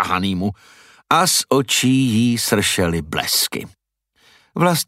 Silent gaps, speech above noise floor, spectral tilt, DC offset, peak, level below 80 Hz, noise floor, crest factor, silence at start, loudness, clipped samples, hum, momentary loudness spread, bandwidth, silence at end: none; 42 dB; -3.5 dB/octave; under 0.1%; -2 dBFS; -48 dBFS; -60 dBFS; 18 dB; 0 s; -17 LUFS; under 0.1%; none; 8 LU; 16 kHz; 0.05 s